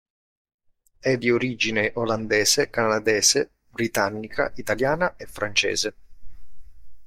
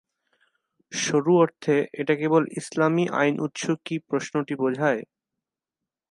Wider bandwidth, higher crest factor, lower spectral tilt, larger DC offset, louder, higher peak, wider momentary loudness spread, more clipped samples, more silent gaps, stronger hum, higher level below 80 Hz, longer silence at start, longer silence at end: first, 16.5 kHz vs 11.5 kHz; about the same, 20 dB vs 18 dB; second, -2.5 dB/octave vs -5.5 dB/octave; neither; about the same, -23 LUFS vs -24 LUFS; about the same, -4 dBFS vs -6 dBFS; about the same, 9 LU vs 8 LU; neither; neither; neither; first, -50 dBFS vs -74 dBFS; first, 1.05 s vs 0.9 s; second, 0 s vs 1.1 s